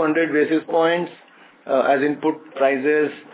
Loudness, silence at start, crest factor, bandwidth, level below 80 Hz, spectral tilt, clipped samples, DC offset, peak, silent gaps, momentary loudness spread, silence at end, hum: -20 LUFS; 0 s; 14 dB; 4 kHz; -80 dBFS; -9.5 dB/octave; under 0.1%; under 0.1%; -6 dBFS; none; 6 LU; 0.1 s; none